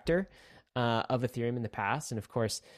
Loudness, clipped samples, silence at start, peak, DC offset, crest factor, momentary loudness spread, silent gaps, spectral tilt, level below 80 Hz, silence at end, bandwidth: -33 LUFS; under 0.1%; 0.05 s; -16 dBFS; under 0.1%; 18 dB; 5 LU; none; -5.5 dB/octave; -58 dBFS; 0 s; 14 kHz